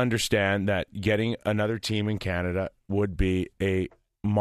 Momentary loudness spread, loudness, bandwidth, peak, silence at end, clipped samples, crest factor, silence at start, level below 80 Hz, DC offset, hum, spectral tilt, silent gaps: 6 LU; -27 LUFS; 14 kHz; -8 dBFS; 0 s; under 0.1%; 20 dB; 0 s; -40 dBFS; under 0.1%; none; -5.5 dB/octave; none